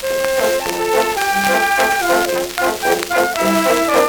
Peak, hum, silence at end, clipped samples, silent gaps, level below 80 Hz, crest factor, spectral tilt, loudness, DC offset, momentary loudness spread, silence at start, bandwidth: 0 dBFS; none; 0 s; under 0.1%; none; -46 dBFS; 16 dB; -2.5 dB/octave; -16 LUFS; under 0.1%; 4 LU; 0 s; over 20 kHz